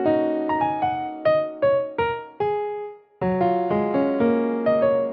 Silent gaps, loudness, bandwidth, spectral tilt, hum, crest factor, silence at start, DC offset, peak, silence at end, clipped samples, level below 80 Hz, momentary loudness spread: none; -23 LUFS; 5.4 kHz; -10 dB/octave; none; 12 dB; 0 s; under 0.1%; -10 dBFS; 0 s; under 0.1%; -58 dBFS; 7 LU